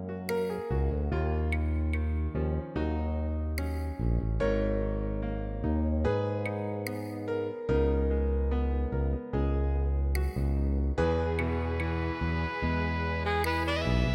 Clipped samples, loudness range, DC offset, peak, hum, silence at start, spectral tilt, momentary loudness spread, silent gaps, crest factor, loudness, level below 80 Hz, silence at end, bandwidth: under 0.1%; 2 LU; under 0.1%; -14 dBFS; none; 0 s; -7.5 dB/octave; 5 LU; none; 14 dB; -31 LUFS; -32 dBFS; 0 s; 16.5 kHz